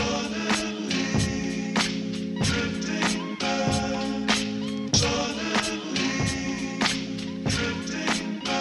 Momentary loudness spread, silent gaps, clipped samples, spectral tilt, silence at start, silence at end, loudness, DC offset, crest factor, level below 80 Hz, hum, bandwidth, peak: 4 LU; none; under 0.1%; -3.5 dB/octave; 0 s; 0 s; -26 LUFS; under 0.1%; 20 dB; -46 dBFS; none; 11.5 kHz; -8 dBFS